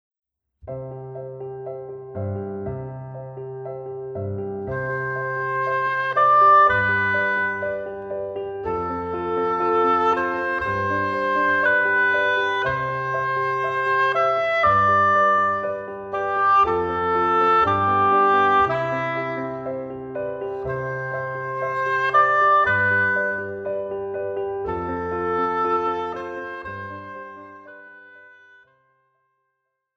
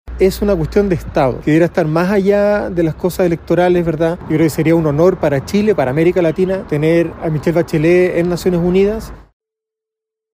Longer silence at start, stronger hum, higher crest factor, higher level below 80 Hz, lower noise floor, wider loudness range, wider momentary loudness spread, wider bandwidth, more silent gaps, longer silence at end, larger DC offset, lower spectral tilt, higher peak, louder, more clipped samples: first, 0.65 s vs 0.05 s; neither; about the same, 16 dB vs 14 dB; second, -54 dBFS vs -34 dBFS; second, -77 dBFS vs -83 dBFS; first, 13 LU vs 1 LU; first, 17 LU vs 4 LU; second, 7.4 kHz vs 16 kHz; neither; first, 1.7 s vs 1.1 s; neither; about the same, -6.5 dB/octave vs -7.5 dB/octave; second, -6 dBFS vs 0 dBFS; second, -21 LUFS vs -14 LUFS; neither